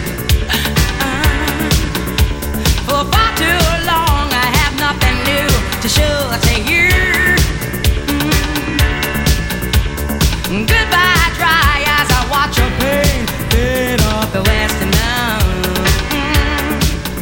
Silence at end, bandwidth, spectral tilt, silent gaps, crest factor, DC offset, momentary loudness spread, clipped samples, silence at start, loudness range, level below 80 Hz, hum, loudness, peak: 0 s; 17 kHz; -4 dB/octave; none; 14 dB; under 0.1%; 5 LU; under 0.1%; 0 s; 2 LU; -20 dBFS; none; -14 LUFS; 0 dBFS